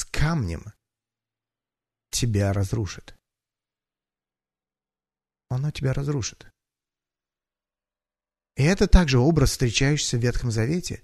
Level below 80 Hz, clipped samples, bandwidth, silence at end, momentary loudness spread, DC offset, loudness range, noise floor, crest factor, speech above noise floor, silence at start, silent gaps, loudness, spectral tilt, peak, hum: -32 dBFS; under 0.1%; 13.5 kHz; 0.1 s; 13 LU; under 0.1%; 10 LU; under -90 dBFS; 22 dB; over 68 dB; 0 s; none; -24 LUFS; -5 dB/octave; -2 dBFS; none